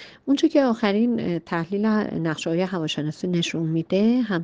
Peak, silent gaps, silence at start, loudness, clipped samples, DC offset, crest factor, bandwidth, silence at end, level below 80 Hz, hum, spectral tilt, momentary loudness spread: -8 dBFS; none; 0 s; -23 LUFS; under 0.1%; under 0.1%; 16 dB; 9.4 kHz; 0 s; -62 dBFS; none; -6 dB/octave; 6 LU